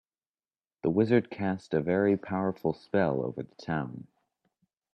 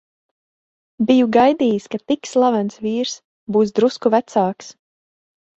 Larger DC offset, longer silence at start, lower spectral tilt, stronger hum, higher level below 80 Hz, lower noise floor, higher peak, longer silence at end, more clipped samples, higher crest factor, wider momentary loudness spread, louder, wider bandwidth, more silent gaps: neither; second, 0.85 s vs 1 s; first, -9 dB/octave vs -5.5 dB/octave; neither; about the same, -66 dBFS vs -62 dBFS; about the same, under -90 dBFS vs under -90 dBFS; second, -10 dBFS vs -2 dBFS; about the same, 0.9 s vs 0.9 s; neither; about the same, 20 dB vs 16 dB; about the same, 10 LU vs 10 LU; second, -29 LUFS vs -18 LUFS; about the same, 8.8 kHz vs 8 kHz; second, none vs 3.25-3.47 s